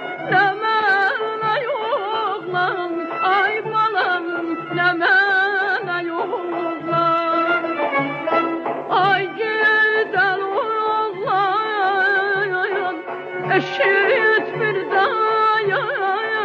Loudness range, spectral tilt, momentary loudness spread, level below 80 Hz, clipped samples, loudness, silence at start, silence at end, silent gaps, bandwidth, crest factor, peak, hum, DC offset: 2 LU; -6 dB/octave; 8 LU; -68 dBFS; under 0.1%; -19 LUFS; 0 s; 0 s; none; 7.8 kHz; 14 dB; -4 dBFS; none; under 0.1%